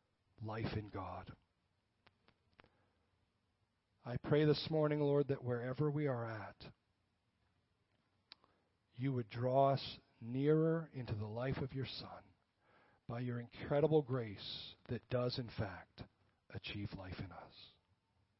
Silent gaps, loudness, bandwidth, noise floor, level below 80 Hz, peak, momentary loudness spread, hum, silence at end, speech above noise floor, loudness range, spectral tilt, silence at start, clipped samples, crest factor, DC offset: none; -40 LUFS; 5.6 kHz; -82 dBFS; -68 dBFS; -20 dBFS; 21 LU; none; 0.7 s; 43 dB; 11 LU; -6 dB/octave; 0.4 s; under 0.1%; 20 dB; under 0.1%